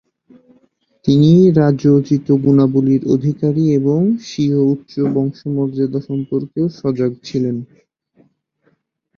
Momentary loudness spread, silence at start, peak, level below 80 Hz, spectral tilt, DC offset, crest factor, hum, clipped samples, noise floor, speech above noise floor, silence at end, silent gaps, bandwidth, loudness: 10 LU; 1.05 s; -2 dBFS; -54 dBFS; -9 dB/octave; under 0.1%; 14 dB; none; under 0.1%; -62 dBFS; 48 dB; 1.55 s; none; 6.8 kHz; -15 LUFS